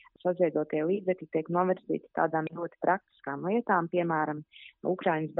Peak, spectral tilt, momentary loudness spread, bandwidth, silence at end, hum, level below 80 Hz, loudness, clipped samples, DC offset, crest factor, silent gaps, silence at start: -12 dBFS; -6 dB/octave; 8 LU; 4 kHz; 0 s; none; -78 dBFS; -30 LUFS; under 0.1%; under 0.1%; 18 dB; none; 0.25 s